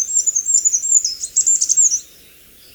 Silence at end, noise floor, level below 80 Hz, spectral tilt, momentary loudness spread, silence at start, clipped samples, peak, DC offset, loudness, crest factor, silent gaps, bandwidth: 0.7 s; -45 dBFS; -60 dBFS; 3.5 dB/octave; 4 LU; 0 s; under 0.1%; -2 dBFS; under 0.1%; -13 LUFS; 16 dB; none; over 20 kHz